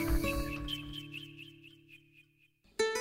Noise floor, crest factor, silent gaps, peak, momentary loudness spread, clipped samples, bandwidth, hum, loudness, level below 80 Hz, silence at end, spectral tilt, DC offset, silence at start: -69 dBFS; 18 dB; none; -18 dBFS; 23 LU; under 0.1%; 16 kHz; none; -38 LUFS; -42 dBFS; 0 s; -4.5 dB/octave; under 0.1%; 0 s